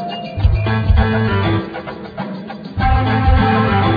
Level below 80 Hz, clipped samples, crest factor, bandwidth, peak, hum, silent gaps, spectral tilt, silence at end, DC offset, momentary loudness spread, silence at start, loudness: -20 dBFS; under 0.1%; 14 dB; 5 kHz; -2 dBFS; none; none; -9.5 dB/octave; 0 s; under 0.1%; 14 LU; 0 s; -16 LUFS